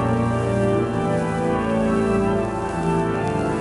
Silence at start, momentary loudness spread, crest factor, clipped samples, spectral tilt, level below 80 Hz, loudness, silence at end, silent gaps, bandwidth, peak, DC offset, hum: 0 s; 3 LU; 12 dB; under 0.1%; -7.5 dB/octave; -38 dBFS; -21 LUFS; 0 s; none; 11.5 kHz; -8 dBFS; under 0.1%; none